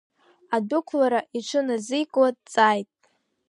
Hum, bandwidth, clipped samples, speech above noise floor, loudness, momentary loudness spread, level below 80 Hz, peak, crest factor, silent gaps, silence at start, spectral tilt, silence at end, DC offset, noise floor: none; 11.5 kHz; under 0.1%; 45 dB; -24 LUFS; 7 LU; -78 dBFS; -4 dBFS; 20 dB; none; 0.5 s; -4 dB/octave; 0.65 s; under 0.1%; -68 dBFS